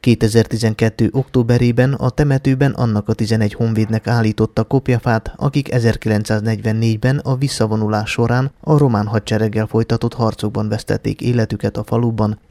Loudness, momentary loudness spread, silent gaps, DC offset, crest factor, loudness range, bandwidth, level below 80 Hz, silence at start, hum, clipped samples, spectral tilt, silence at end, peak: -17 LUFS; 5 LU; none; under 0.1%; 16 dB; 2 LU; 13.5 kHz; -38 dBFS; 0.05 s; none; under 0.1%; -7 dB/octave; 0.15 s; 0 dBFS